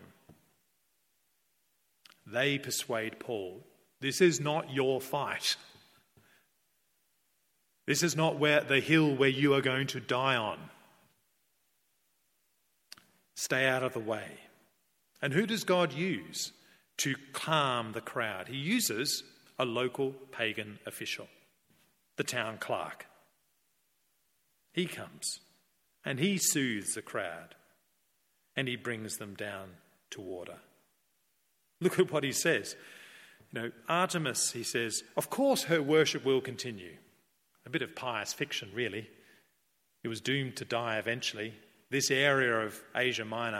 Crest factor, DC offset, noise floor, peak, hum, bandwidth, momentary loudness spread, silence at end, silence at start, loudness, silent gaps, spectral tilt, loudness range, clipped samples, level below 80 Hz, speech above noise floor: 22 dB; under 0.1%; -76 dBFS; -12 dBFS; none; 16.5 kHz; 16 LU; 0 s; 0 s; -32 LUFS; none; -3.5 dB/octave; 10 LU; under 0.1%; -78 dBFS; 44 dB